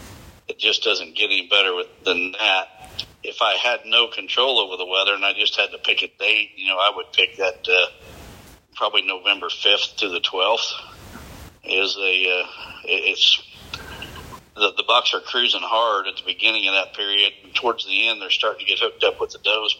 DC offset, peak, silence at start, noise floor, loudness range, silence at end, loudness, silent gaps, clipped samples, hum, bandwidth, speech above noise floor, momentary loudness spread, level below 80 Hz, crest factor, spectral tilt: under 0.1%; -2 dBFS; 0 s; -45 dBFS; 2 LU; 0 s; -19 LUFS; none; under 0.1%; none; 16 kHz; 24 dB; 15 LU; -56 dBFS; 20 dB; -1 dB/octave